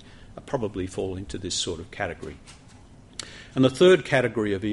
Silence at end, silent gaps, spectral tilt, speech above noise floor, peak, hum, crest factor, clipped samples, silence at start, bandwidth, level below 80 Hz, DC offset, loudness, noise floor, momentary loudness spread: 0 s; none; -5 dB/octave; 25 dB; -6 dBFS; none; 20 dB; under 0.1%; 0.1 s; 11.5 kHz; -50 dBFS; under 0.1%; -24 LUFS; -49 dBFS; 22 LU